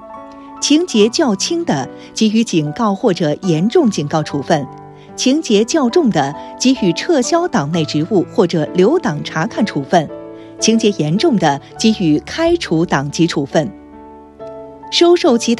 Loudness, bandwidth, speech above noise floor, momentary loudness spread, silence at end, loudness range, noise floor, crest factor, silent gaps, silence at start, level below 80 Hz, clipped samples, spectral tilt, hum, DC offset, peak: -15 LUFS; 12 kHz; 23 dB; 10 LU; 0 s; 1 LU; -37 dBFS; 14 dB; none; 0 s; -48 dBFS; under 0.1%; -5 dB/octave; none; under 0.1%; 0 dBFS